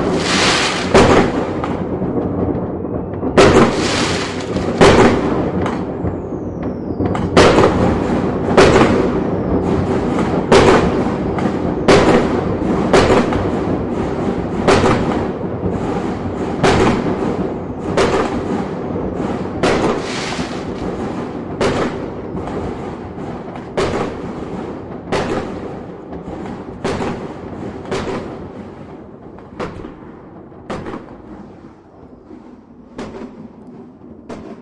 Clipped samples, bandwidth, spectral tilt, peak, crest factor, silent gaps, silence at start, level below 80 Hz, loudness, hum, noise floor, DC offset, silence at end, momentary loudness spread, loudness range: under 0.1%; 11.5 kHz; -5.5 dB/octave; 0 dBFS; 16 dB; none; 0 s; -34 dBFS; -16 LUFS; none; -40 dBFS; under 0.1%; 0 s; 20 LU; 18 LU